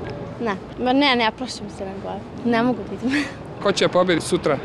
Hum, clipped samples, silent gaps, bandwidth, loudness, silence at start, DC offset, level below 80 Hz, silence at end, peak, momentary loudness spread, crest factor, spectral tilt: none; under 0.1%; none; 12.5 kHz; -22 LUFS; 0 s; under 0.1%; -48 dBFS; 0 s; -6 dBFS; 13 LU; 16 dB; -4.5 dB/octave